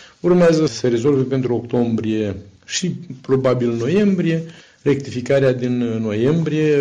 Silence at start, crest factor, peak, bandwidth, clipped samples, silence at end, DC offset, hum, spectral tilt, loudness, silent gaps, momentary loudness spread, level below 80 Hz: 0 s; 12 dB; -6 dBFS; 9.8 kHz; under 0.1%; 0 s; under 0.1%; none; -6.5 dB/octave; -18 LUFS; none; 9 LU; -52 dBFS